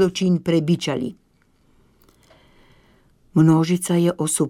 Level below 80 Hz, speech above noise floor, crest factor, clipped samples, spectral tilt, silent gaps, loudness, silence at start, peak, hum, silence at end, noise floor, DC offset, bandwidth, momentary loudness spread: -56 dBFS; 42 dB; 16 dB; under 0.1%; -6 dB/octave; none; -20 LUFS; 0 s; -6 dBFS; none; 0 s; -60 dBFS; under 0.1%; 15.5 kHz; 9 LU